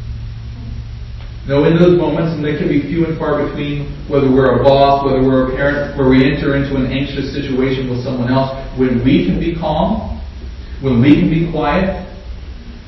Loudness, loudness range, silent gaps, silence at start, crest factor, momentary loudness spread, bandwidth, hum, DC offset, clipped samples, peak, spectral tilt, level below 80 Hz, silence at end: -14 LUFS; 3 LU; none; 0 s; 14 dB; 18 LU; 6 kHz; none; under 0.1%; under 0.1%; 0 dBFS; -9 dB/octave; -28 dBFS; 0 s